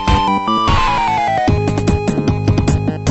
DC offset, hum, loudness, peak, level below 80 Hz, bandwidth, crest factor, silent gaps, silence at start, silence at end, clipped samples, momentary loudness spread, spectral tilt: under 0.1%; none; -15 LUFS; -2 dBFS; -24 dBFS; 8.4 kHz; 12 dB; none; 0 s; 0 s; under 0.1%; 3 LU; -6 dB/octave